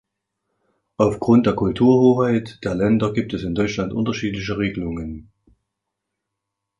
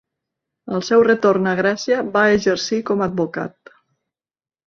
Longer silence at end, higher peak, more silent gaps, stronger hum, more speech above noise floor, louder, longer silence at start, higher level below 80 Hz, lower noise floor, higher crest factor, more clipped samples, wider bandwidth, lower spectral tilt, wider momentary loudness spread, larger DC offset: first, 1.55 s vs 1.2 s; about the same, -4 dBFS vs -2 dBFS; neither; neither; second, 62 dB vs over 73 dB; about the same, -20 LUFS vs -18 LUFS; first, 1 s vs 0.65 s; first, -44 dBFS vs -58 dBFS; second, -81 dBFS vs under -90 dBFS; about the same, 18 dB vs 16 dB; neither; first, 9 kHz vs 7.4 kHz; first, -7.5 dB/octave vs -5 dB/octave; about the same, 12 LU vs 11 LU; neither